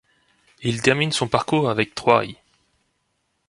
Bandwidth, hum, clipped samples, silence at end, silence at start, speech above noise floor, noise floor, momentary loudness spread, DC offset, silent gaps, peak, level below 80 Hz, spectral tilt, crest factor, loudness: 11.5 kHz; none; under 0.1%; 1.15 s; 0.6 s; 51 dB; -72 dBFS; 8 LU; under 0.1%; none; 0 dBFS; -56 dBFS; -4.5 dB/octave; 22 dB; -20 LUFS